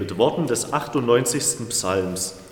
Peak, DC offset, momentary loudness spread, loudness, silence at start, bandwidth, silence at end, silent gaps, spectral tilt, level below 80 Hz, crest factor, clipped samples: -4 dBFS; under 0.1%; 5 LU; -22 LUFS; 0 s; 17.5 kHz; 0 s; none; -3.5 dB/octave; -56 dBFS; 18 dB; under 0.1%